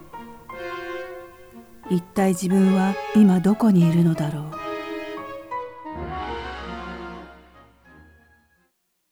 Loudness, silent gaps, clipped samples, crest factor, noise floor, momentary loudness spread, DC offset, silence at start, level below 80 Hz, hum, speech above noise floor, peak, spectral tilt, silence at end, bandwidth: -22 LUFS; none; under 0.1%; 16 dB; -70 dBFS; 21 LU; 0.1%; 0 s; -48 dBFS; none; 51 dB; -6 dBFS; -7.5 dB/octave; 1.8 s; 19.5 kHz